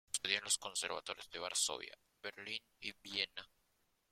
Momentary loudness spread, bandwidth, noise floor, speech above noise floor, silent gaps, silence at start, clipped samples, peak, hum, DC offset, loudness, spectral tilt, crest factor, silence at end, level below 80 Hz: 14 LU; 16.5 kHz; -79 dBFS; 36 dB; none; 0.15 s; under 0.1%; -16 dBFS; none; under 0.1%; -40 LUFS; 1 dB/octave; 26 dB; 0.65 s; -78 dBFS